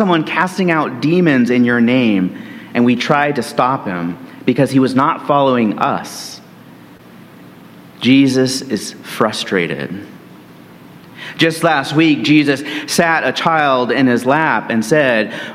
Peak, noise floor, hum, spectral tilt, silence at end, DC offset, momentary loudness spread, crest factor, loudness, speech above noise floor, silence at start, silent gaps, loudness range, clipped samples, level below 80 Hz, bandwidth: 0 dBFS; -39 dBFS; none; -5 dB/octave; 0 s; under 0.1%; 10 LU; 16 dB; -14 LUFS; 25 dB; 0 s; none; 5 LU; under 0.1%; -58 dBFS; 16 kHz